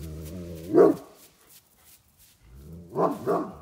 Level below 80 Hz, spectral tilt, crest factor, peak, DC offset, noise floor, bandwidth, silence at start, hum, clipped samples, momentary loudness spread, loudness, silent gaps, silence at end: -54 dBFS; -7.5 dB/octave; 22 dB; -6 dBFS; under 0.1%; -58 dBFS; 16 kHz; 0 s; none; under 0.1%; 21 LU; -24 LUFS; none; 0 s